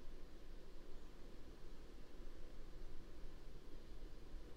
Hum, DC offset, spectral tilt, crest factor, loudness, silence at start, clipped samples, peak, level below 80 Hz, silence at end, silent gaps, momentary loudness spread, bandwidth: none; under 0.1%; -5.5 dB/octave; 10 dB; -61 LUFS; 0 s; under 0.1%; -38 dBFS; -52 dBFS; 0 s; none; 2 LU; 7.8 kHz